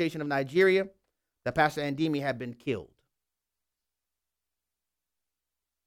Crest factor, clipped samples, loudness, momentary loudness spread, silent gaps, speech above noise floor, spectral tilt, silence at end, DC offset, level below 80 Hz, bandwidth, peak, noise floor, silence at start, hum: 22 dB; under 0.1%; -29 LUFS; 13 LU; none; 61 dB; -6 dB/octave; 3 s; under 0.1%; -66 dBFS; 16 kHz; -10 dBFS; -89 dBFS; 0 s; 60 Hz at -65 dBFS